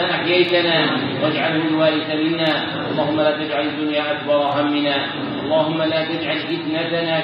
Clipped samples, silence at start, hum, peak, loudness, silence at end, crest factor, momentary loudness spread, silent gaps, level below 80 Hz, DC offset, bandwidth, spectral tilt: under 0.1%; 0 s; none; -4 dBFS; -19 LUFS; 0 s; 16 dB; 6 LU; none; -64 dBFS; under 0.1%; 5.6 kHz; -7.5 dB/octave